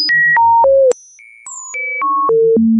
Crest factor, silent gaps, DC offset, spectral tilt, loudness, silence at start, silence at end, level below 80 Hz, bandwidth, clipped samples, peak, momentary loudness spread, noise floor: 8 dB; none; under 0.1%; -4 dB/octave; -11 LUFS; 0 s; 0 s; -54 dBFS; 9.4 kHz; under 0.1%; -6 dBFS; 15 LU; -41 dBFS